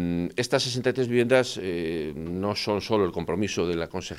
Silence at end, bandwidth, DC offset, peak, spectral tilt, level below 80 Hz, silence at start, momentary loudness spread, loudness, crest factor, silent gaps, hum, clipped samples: 0 s; 15 kHz; under 0.1%; -8 dBFS; -5 dB/octave; -56 dBFS; 0 s; 8 LU; -26 LUFS; 18 dB; none; none; under 0.1%